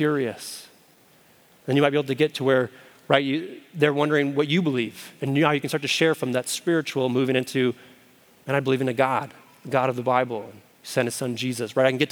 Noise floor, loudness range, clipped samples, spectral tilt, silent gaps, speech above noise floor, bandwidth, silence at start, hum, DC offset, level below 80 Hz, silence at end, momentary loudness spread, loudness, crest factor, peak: -56 dBFS; 3 LU; under 0.1%; -5 dB/octave; none; 33 dB; over 20 kHz; 0 s; none; under 0.1%; -78 dBFS; 0 s; 14 LU; -24 LUFS; 24 dB; 0 dBFS